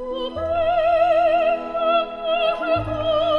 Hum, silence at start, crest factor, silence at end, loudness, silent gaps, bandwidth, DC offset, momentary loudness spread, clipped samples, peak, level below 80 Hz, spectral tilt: none; 0 s; 12 dB; 0 s; -20 LUFS; none; 5.6 kHz; under 0.1%; 6 LU; under 0.1%; -8 dBFS; -44 dBFS; -6.5 dB/octave